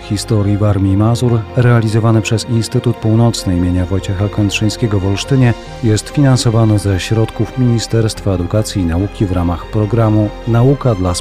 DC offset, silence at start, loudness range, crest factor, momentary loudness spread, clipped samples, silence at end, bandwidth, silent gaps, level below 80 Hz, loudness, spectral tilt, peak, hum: 0.2%; 0 s; 2 LU; 10 dB; 5 LU; under 0.1%; 0 s; 14 kHz; none; -32 dBFS; -14 LUFS; -6.5 dB/octave; -2 dBFS; none